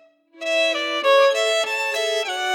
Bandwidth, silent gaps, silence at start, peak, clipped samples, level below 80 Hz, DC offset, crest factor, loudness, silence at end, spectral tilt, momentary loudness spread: 17.5 kHz; none; 0.35 s; -8 dBFS; under 0.1%; under -90 dBFS; under 0.1%; 14 dB; -19 LUFS; 0 s; 1.5 dB/octave; 7 LU